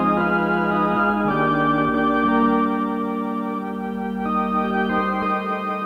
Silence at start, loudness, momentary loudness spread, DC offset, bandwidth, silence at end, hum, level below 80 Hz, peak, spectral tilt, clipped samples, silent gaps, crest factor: 0 s; -21 LUFS; 7 LU; under 0.1%; 6.6 kHz; 0 s; none; -48 dBFS; -8 dBFS; -8 dB/octave; under 0.1%; none; 14 dB